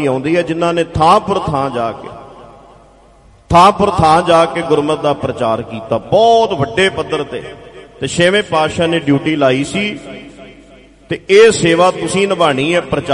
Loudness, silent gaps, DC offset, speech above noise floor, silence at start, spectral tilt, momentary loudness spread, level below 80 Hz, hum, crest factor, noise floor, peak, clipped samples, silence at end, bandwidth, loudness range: -13 LUFS; none; under 0.1%; 32 dB; 0 s; -5 dB/octave; 13 LU; -40 dBFS; none; 14 dB; -44 dBFS; 0 dBFS; under 0.1%; 0 s; 11.5 kHz; 3 LU